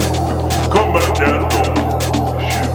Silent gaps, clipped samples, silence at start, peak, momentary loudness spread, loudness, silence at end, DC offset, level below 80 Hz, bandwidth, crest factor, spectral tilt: none; under 0.1%; 0 s; 0 dBFS; 4 LU; -16 LUFS; 0 s; under 0.1%; -26 dBFS; over 20 kHz; 14 dB; -5.5 dB/octave